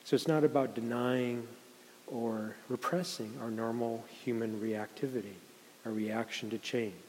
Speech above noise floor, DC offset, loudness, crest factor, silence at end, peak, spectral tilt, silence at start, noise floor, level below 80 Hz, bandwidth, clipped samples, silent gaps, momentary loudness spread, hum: 20 dB; under 0.1%; -35 LUFS; 22 dB; 0 s; -14 dBFS; -5.5 dB/octave; 0.05 s; -54 dBFS; -86 dBFS; 16 kHz; under 0.1%; none; 15 LU; none